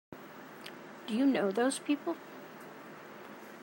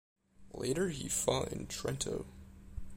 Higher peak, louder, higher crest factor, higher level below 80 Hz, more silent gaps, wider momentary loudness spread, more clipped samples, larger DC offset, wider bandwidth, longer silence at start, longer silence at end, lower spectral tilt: about the same, -18 dBFS vs -16 dBFS; first, -32 LUFS vs -36 LUFS; about the same, 18 dB vs 22 dB; second, -88 dBFS vs -52 dBFS; neither; about the same, 19 LU vs 19 LU; neither; neither; about the same, 16 kHz vs 16 kHz; second, 0.1 s vs 0.4 s; about the same, 0 s vs 0 s; about the same, -4.5 dB/octave vs -4 dB/octave